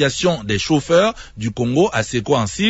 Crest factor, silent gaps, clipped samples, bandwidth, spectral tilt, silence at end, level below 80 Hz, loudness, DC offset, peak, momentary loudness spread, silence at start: 14 dB; none; under 0.1%; 8 kHz; -5 dB/octave; 0 s; -44 dBFS; -18 LUFS; under 0.1%; -4 dBFS; 7 LU; 0 s